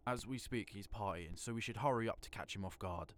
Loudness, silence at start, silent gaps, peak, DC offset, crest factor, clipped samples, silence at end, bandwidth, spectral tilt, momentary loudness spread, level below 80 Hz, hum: -43 LUFS; 0.05 s; none; -24 dBFS; under 0.1%; 20 dB; under 0.1%; 0 s; 19 kHz; -5 dB/octave; 9 LU; -58 dBFS; none